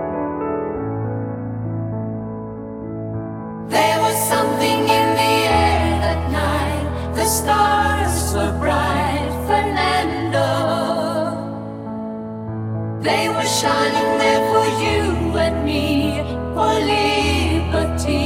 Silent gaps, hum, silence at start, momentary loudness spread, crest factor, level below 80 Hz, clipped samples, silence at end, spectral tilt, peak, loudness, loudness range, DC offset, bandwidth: none; none; 0 s; 12 LU; 16 dB; -32 dBFS; under 0.1%; 0 s; -4.5 dB/octave; -2 dBFS; -19 LUFS; 5 LU; under 0.1%; 17 kHz